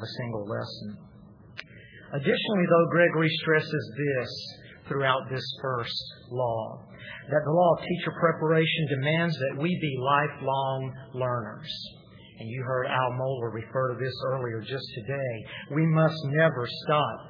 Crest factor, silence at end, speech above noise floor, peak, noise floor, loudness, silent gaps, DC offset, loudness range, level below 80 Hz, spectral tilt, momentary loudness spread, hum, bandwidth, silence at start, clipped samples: 20 dB; 0 s; 21 dB; -8 dBFS; -49 dBFS; -27 LUFS; none; under 0.1%; 5 LU; -64 dBFS; -7.5 dB/octave; 14 LU; none; 5.4 kHz; 0 s; under 0.1%